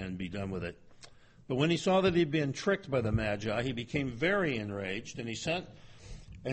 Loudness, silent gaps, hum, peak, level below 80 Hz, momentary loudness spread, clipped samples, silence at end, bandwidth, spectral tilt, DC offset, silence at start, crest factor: -32 LUFS; none; none; -16 dBFS; -54 dBFS; 14 LU; under 0.1%; 0 s; 8.4 kHz; -5.5 dB/octave; under 0.1%; 0 s; 18 dB